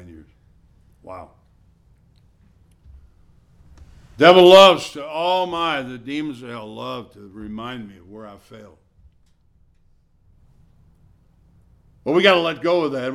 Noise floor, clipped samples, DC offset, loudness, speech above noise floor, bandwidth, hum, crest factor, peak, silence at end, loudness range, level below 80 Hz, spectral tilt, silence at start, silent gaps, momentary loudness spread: -57 dBFS; under 0.1%; under 0.1%; -15 LUFS; 40 dB; 14 kHz; none; 20 dB; 0 dBFS; 0 s; 22 LU; -54 dBFS; -4.5 dB/octave; 1.1 s; none; 30 LU